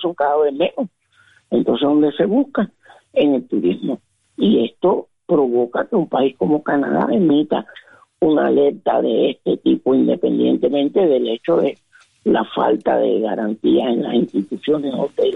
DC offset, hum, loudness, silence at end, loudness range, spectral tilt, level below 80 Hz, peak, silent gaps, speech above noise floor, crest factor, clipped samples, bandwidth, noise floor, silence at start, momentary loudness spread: under 0.1%; none; -18 LUFS; 0 s; 2 LU; -8.5 dB/octave; -58 dBFS; -4 dBFS; none; 38 dB; 12 dB; under 0.1%; 4 kHz; -55 dBFS; 0 s; 7 LU